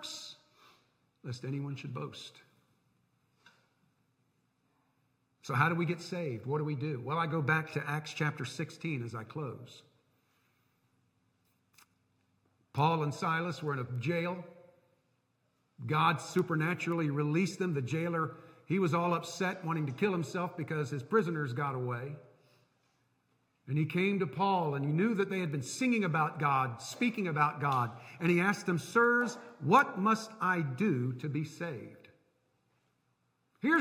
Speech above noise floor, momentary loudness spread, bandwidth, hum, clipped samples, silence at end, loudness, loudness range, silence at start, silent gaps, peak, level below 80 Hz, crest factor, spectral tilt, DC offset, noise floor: 44 dB; 12 LU; 16 kHz; none; under 0.1%; 0 s; -33 LUFS; 14 LU; 0 s; none; -12 dBFS; -80 dBFS; 22 dB; -6 dB/octave; under 0.1%; -77 dBFS